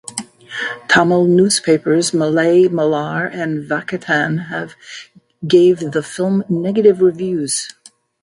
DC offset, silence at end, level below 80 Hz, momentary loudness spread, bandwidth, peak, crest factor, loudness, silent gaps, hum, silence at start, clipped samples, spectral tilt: under 0.1%; 0.5 s; -60 dBFS; 16 LU; 11.5 kHz; 0 dBFS; 16 dB; -15 LUFS; none; none; 0.1 s; under 0.1%; -5 dB/octave